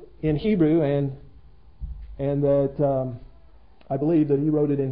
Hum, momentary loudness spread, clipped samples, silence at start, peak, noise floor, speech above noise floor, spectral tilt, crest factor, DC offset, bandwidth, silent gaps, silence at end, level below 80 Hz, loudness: none; 20 LU; under 0.1%; 0 s; -8 dBFS; -53 dBFS; 31 dB; -13 dB/octave; 14 dB; 0.3%; 4.9 kHz; none; 0 s; -44 dBFS; -23 LUFS